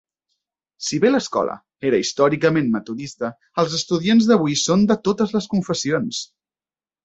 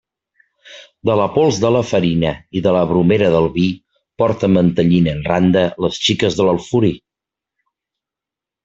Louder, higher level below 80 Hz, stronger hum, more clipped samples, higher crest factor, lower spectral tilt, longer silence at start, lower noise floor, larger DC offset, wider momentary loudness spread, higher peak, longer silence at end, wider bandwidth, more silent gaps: second, -20 LUFS vs -16 LUFS; second, -58 dBFS vs -46 dBFS; neither; neither; about the same, 18 dB vs 16 dB; second, -5 dB/octave vs -6.5 dB/octave; about the same, 0.8 s vs 0.7 s; first, under -90 dBFS vs -86 dBFS; neither; first, 11 LU vs 6 LU; about the same, -2 dBFS vs 0 dBFS; second, 0.8 s vs 1.65 s; about the same, 8.2 kHz vs 7.8 kHz; neither